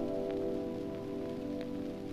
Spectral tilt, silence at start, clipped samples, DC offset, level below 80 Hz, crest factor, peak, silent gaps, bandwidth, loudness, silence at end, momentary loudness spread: -7.5 dB/octave; 0 s; under 0.1%; under 0.1%; -58 dBFS; 14 dB; -24 dBFS; none; 14 kHz; -38 LUFS; 0 s; 4 LU